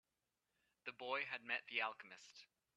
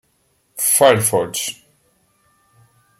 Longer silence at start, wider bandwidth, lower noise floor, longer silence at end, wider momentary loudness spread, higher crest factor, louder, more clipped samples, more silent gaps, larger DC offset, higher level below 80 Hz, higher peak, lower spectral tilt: first, 0.85 s vs 0.55 s; second, 11.5 kHz vs 16.5 kHz; first, under -90 dBFS vs -63 dBFS; second, 0.3 s vs 1.45 s; first, 17 LU vs 14 LU; about the same, 24 dB vs 20 dB; second, -44 LUFS vs -16 LUFS; neither; neither; neither; second, under -90 dBFS vs -64 dBFS; second, -26 dBFS vs -2 dBFS; about the same, -2 dB/octave vs -2.5 dB/octave